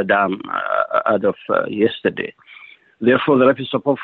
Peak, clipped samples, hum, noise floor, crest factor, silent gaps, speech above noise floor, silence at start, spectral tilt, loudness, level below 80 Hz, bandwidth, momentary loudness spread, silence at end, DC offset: -4 dBFS; under 0.1%; none; -44 dBFS; 14 dB; none; 26 dB; 0 s; -9 dB/octave; -18 LUFS; -62 dBFS; 4.4 kHz; 8 LU; 0 s; under 0.1%